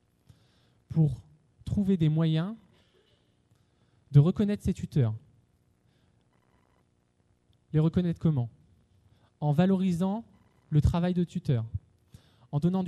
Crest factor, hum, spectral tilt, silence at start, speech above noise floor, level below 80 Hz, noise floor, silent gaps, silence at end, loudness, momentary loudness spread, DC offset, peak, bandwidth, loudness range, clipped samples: 20 dB; 60 Hz at -55 dBFS; -9 dB/octave; 0.9 s; 44 dB; -48 dBFS; -69 dBFS; none; 0 s; -28 LUFS; 13 LU; under 0.1%; -10 dBFS; 10 kHz; 5 LU; under 0.1%